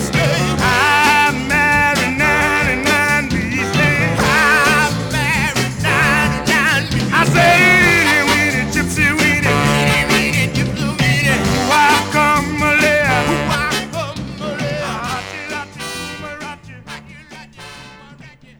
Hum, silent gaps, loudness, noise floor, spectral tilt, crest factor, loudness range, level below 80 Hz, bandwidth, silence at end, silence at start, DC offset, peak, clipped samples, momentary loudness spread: none; none; -13 LUFS; -41 dBFS; -4 dB/octave; 14 dB; 12 LU; -34 dBFS; 19.5 kHz; 0.3 s; 0 s; under 0.1%; 0 dBFS; under 0.1%; 14 LU